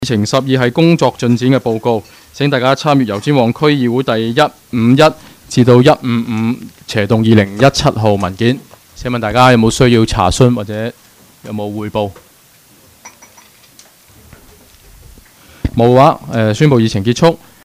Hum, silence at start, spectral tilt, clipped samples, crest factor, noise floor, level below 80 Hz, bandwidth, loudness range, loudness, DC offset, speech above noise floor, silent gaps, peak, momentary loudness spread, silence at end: none; 0 s; -6 dB/octave; under 0.1%; 12 dB; -46 dBFS; -36 dBFS; 16 kHz; 14 LU; -12 LUFS; under 0.1%; 34 dB; none; 0 dBFS; 11 LU; 0.3 s